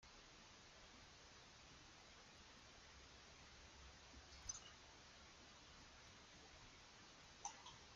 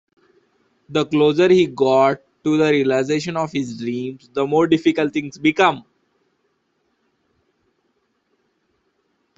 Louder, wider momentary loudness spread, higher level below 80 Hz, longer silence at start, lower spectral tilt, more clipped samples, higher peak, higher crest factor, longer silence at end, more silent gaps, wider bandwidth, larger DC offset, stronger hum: second, -60 LUFS vs -18 LUFS; about the same, 8 LU vs 10 LU; second, -72 dBFS vs -62 dBFS; second, 0 s vs 0.9 s; second, -1.5 dB/octave vs -6 dB/octave; neither; second, -34 dBFS vs -2 dBFS; first, 28 dB vs 18 dB; second, 0 s vs 3.6 s; neither; about the same, 8.8 kHz vs 8 kHz; neither; neither